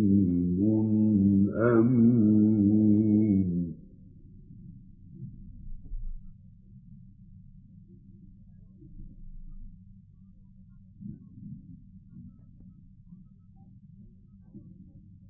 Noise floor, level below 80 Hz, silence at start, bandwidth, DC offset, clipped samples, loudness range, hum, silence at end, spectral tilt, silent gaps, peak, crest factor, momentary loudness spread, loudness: -53 dBFS; -48 dBFS; 0 s; 2.4 kHz; under 0.1%; under 0.1%; 27 LU; none; 0.7 s; -14.5 dB/octave; none; -12 dBFS; 18 dB; 26 LU; -24 LUFS